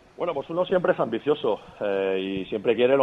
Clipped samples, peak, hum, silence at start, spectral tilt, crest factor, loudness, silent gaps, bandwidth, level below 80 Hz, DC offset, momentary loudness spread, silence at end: under 0.1%; -8 dBFS; none; 0.2 s; -7.5 dB/octave; 18 dB; -25 LUFS; none; 5.8 kHz; -62 dBFS; under 0.1%; 7 LU; 0 s